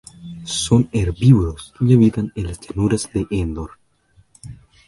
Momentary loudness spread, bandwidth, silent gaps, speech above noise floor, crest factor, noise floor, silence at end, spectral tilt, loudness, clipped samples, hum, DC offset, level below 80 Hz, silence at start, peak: 15 LU; 11.5 kHz; none; 39 dB; 18 dB; -56 dBFS; 0.35 s; -6.5 dB/octave; -18 LUFS; under 0.1%; none; under 0.1%; -34 dBFS; 0.2 s; 0 dBFS